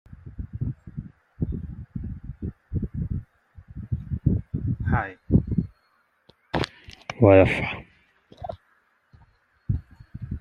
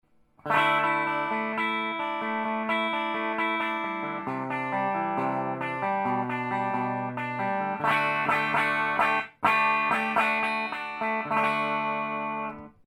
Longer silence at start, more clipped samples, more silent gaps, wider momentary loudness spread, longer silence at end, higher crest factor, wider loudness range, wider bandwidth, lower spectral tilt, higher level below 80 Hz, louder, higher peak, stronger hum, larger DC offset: second, 0.1 s vs 0.45 s; neither; neither; first, 20 LU vs 8 LU; second, 0 s vs 0.15 s; about the same, 24 dB vs 20 dB; first, 11 LU vs 4 LU; second, 9.8 kHz vs 19.5 kHz; first, -8.5 dB/octave vs -5.5 dB/octave; first, -40 dBFS vs -70 dBFS; about the same, -26 LUFS vs -27 LUFS; first, -2 dBFS vs -8 dBFS; neither; neither